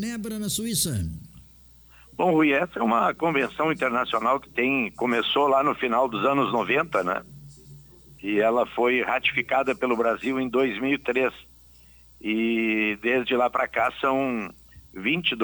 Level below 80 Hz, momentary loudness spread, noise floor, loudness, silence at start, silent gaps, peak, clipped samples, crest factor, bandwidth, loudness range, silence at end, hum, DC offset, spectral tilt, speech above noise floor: -54 dBFS; 7 LU; -52 dBFS; -24 LUFS; 0 s; none; -8 dBFS; under 0.1%; 16 dB; over 20 kHz; 2 LU; 0 s; none; under 0.1%; -4 dB/octave; 28 dB